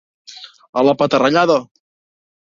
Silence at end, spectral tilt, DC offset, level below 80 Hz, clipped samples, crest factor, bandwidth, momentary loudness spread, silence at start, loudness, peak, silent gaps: 0.9 s; -5.5 dB/octave; under 0.1%; -60 dBFS; under 0.1%; 18 dB; 7.4 kHz; 22 LU; 0.3 s; -15 LUFS; 0 dBFS; 0.69-0.73 s